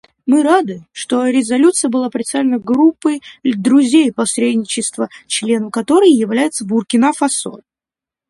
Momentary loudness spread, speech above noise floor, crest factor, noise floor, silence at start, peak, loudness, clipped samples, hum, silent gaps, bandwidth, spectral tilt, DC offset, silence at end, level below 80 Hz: 9 LU; 75 dB; 14 dB; -89 dBFS; 0.25 s; 0 dBFS; -14 LUFS; under 0.1%; none; none; 11.5 kHz; -3.5 dB/octave; under 0.1%; 0.75 s; -62 dBFS